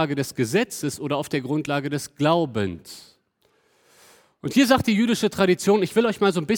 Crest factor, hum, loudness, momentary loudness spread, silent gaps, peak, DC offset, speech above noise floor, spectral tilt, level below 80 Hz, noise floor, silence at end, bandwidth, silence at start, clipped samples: 18 dB; none; -22 LUFS; 11 LU; none; -4 dBFS; under 0.1%; 44 dB; -5 dB/octave; -58 dBFS; -66 dBFS; 0 s; 19.5 kHz; 0 s; under 0.1%